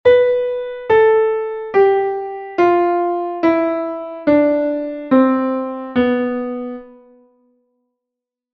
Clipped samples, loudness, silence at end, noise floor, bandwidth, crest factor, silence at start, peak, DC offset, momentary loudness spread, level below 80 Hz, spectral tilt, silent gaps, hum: under 0.1%; -17 LUFS; 1.65 s; -83 dBFS; 6.2 kHz; 16 dB; 0.05 s; -2 dBFS; under 0.1%; 11 LU; -54 dBFS; -7.5 dB/octave; none; none